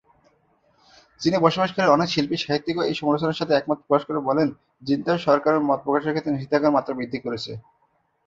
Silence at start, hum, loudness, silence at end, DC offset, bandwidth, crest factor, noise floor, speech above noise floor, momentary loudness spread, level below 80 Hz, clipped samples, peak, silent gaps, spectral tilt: 1.2 s; none; -22 LUFS; 0.65 s; under 0.1%; 7.6 kHz; 20 dB; -67 dBFS; 45 dB; 9 LU; -60 dBFS; under 0.1%; -2 dBFS; none; -6 dB/octave